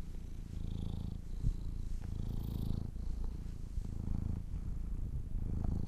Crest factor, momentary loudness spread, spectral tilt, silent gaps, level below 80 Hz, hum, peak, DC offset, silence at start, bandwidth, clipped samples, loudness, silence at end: 16 dB; 5 LU; -8 dB/octave; none; -40 dBFS; none; -22 dBFS; under 0.1%; 0 s; 13.5 kHz; under 0.1%; -43 LUFS; 0 s